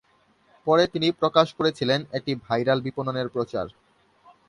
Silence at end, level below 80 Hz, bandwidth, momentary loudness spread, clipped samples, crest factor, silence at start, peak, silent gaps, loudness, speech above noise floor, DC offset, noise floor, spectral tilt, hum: 0.8 s; -60 dBFS; 11 kHz; 9 LU; under 0.1%; 22 dB; 0.65 s; -4 dBFS; none; -24 LUFS; 39 dB; under 0.1%; -62 dBFS; -6 dB/octave; none